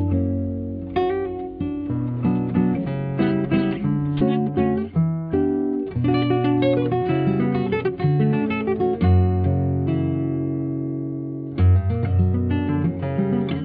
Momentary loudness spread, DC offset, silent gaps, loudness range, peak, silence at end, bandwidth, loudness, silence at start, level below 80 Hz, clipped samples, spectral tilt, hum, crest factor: 7 LU; under 0.1%; none; 2 LU; -6 dBFS; 0 s; 5 kHz; -22 LUFS; 0 s; -42 dBFS; under 0.1%; -11.5 dB/octave; none; 14 dB